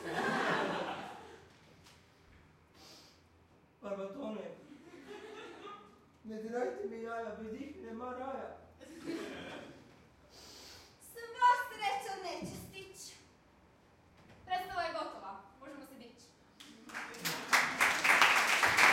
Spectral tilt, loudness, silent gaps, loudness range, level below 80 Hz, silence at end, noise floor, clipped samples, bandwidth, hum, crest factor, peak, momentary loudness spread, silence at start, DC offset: -2 dB/octave; -34 LUFS; none; 13 LU; -72 dBFS; 0 s; -65 dBFS; under 0.1%; 16.5 kHz; none; 28 dB; -10 dBFS; 27 LU; 0 s; under 0.1%